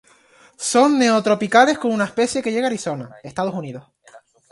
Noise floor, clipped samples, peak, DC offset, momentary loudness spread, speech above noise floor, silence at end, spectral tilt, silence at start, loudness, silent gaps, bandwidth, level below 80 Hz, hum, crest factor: -52 dBFS; under 0.1%; 0 dBFS; under 0.1%; 16 LU; 34 dB; 0.35 s; -4 dB/octave; 0.6 s; -18 LUFS; none; 11.5 kHz; -62 dBFS; none; 20 dB